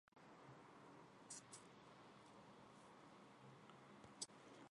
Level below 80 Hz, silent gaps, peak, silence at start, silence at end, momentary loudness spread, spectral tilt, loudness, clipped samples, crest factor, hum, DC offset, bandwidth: under -90 dBFS; none; -34 dBFS; 0.15 s; 0 s; 10 LU; -2.5 dB/octave; -61 LUFS; under 0.1%; 28 dB; none; under 0.1%; 11 kHz